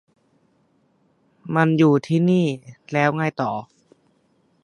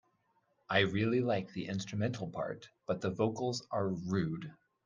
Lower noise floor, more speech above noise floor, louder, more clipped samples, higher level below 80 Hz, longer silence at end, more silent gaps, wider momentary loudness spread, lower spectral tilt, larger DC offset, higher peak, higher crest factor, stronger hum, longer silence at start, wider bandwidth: second, -63 dBFS vs -76 dBFS; about the same, 44 dB vs 41 dB; first, -20 LUFS vs -35 LUFS; neither; about the same, -68 dBFS vs -70 dBFS; first, 1 s vs 0.35 s; neither; first, 13 LU vs 10 LU; first, -7.5 dB/octave vs -6 dB/octave; neither; first, -2 dBFS vs -14 dBFS; about the same, 20 dB vs 22 dB; neither; first, 1.45 s vs 0.7 s; about the same, 10.5 kHz vs 9.8 kHz